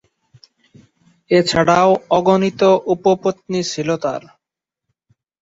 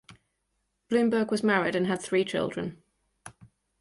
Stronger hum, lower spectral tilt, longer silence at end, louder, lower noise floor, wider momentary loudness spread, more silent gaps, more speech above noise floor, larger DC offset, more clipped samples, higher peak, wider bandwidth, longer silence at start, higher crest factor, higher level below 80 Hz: neither; about the same, -5.5 dB/octave vs -5.5 dB/octave; first, 1.25 s vs 0.35 s; first, -16 LUFS vs -27 LUFS; first, -84 dBFS vs -78 dBFS; about the same, 8 LU vs 8 LU; neither; first, 69 dB vs 51 dB; neither; neither; first, -2 dBFS vs -12 dBFS; second, 8 kHz vs 11.5 kHz; first, 1.3 s vs 0.1 s; about the same, 16 dB vs 18 dB; first, -54 dBFS vs -66 dBFS